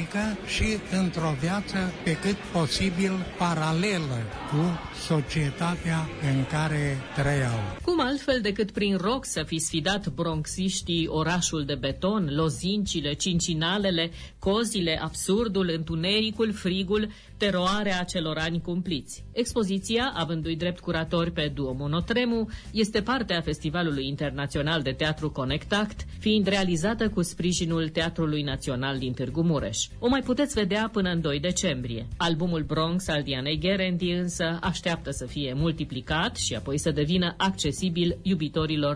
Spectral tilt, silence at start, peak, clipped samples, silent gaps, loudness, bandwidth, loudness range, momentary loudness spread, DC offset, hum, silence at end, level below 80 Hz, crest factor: -5 dB/octave; 0 s; -12 dBFS; under 0.1%; none; -27 LUFS; 11 kHz; 1 LU; 4 LU; under 0.1%; none; 0 s; -44 dBFS; 14 dB